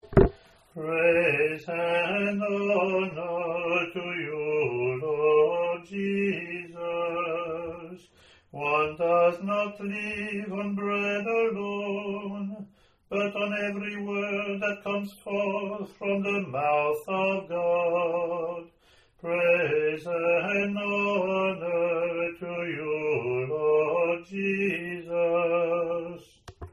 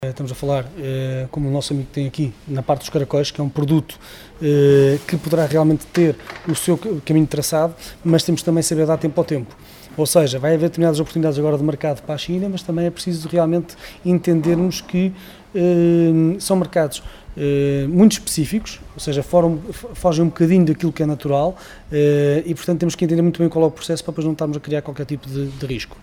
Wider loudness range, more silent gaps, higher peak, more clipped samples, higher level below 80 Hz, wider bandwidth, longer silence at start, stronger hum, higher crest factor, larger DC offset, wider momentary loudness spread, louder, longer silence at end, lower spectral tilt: about the same, 4 LU vs 3 LU; neither; about the same, -2 dBFS vs -2 dBFS; neither; about the same, -48 dBFS vs -44 dBFS; second, 12.5 kHz vs 18 kHz; about the same, 0.05 s vs 0 s; neither; first, 26 dB vs 16 dB; neither; about the same, 10 LU vs 11 LU; second, -27 LUFS vs -19 LUFS; about the same, 0.05 s vs 0.05 s; about the same, -7 dB/octave vs -6.5 dB/octave